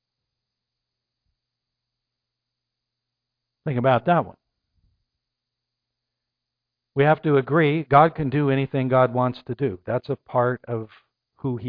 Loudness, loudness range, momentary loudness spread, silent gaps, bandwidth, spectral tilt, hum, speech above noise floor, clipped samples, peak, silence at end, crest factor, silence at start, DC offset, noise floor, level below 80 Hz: -22 LUFS; 8 LU; 14 LU; none; 5 kHz; -11 dB/octave; none; 63 dB; under 0.1%; -2 dBFS; 0 s; 22 dB; 3.65 s; under 0.1%; -84 dBFS; -60 dBFS